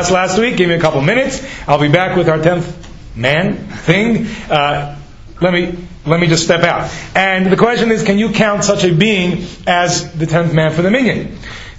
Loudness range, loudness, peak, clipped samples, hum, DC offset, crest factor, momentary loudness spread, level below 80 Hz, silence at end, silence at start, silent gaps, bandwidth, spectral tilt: 3 LU; -13 LUFS; 0 dBFS; under 0.1%; none; under 0.1%; 14 dB; 9 LU; -36 dBFS; 0 s; 0 s; none; 8 kHz; -5 dB/octave